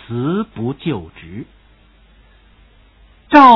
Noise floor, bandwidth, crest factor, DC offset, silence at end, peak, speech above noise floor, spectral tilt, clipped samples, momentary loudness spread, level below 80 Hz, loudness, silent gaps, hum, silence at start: -49 dBFS; 6 kHz; 16 dB; under 0.1%; 0 s; 0 dBFS; 27 dB; -7.5 dB/octave; 0.6%; 22 LU; -48 dBFS; -17 LUFS; none; none; 0.1 s